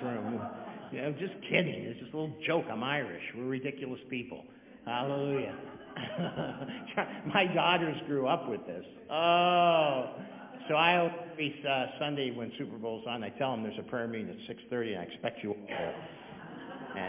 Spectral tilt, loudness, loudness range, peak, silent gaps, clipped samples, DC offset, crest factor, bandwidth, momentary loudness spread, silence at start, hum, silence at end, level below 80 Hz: -3 dB/octave; -33 LUFS; 8 LU; -10 dBFS; none; under 0.1%; under 0.1%; 24 dB; 3.8 kHz; 18 LU; 0 s; none; 0 s; -72 dBFS